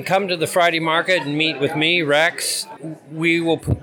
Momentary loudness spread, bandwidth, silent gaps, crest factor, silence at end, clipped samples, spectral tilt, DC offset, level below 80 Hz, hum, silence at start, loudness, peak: 7 LU; 19.5 kHz; none; 14 dB; 0 s; under 0.1%; -4 dB/octave; under 0.1%; -46 dBFS; none; 0 s; -18 LUFS; -6 dBFS